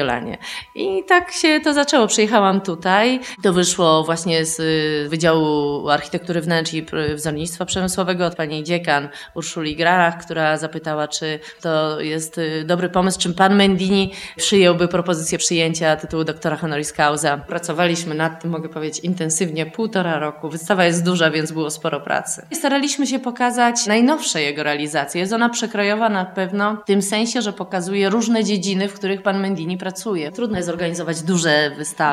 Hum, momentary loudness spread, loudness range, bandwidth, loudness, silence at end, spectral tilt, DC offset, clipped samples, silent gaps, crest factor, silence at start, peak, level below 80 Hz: none; 9 LU; 4 LU; 14 kHz; -19 LUFS; 0 s; -4 dB/octave; under 0.1%; under 0.1%; none; 18 dB; 0 s; 0 dBFS; -52 dBFS